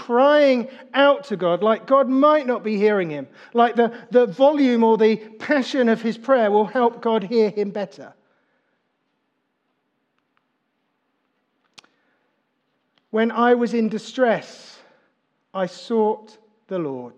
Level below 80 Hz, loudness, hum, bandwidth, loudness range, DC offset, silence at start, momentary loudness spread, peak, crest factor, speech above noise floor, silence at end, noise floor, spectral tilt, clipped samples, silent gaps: -88 dBFS; -19 LUFS; none; 8.6 kHz; 8 LU; under 0.1%; 0 s; 12 LU; -4 dBFS; 18 dB; 53 dB; 0.1 s; -72 dBFS; -6 dB/octave; under 0.1%; none